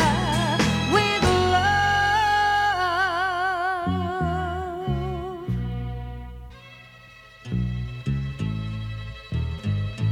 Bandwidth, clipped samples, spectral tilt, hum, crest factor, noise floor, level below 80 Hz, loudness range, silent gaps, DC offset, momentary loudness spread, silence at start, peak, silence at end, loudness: 16.5 kHz; under 0.1%; -5 dB/octave; none; 16 dB; -47 dBFS; -38 dBFS; 11 LU; none; under 0.1%; 15 LU; 0 s; -8 dBFS; 0 s; -24 LUFS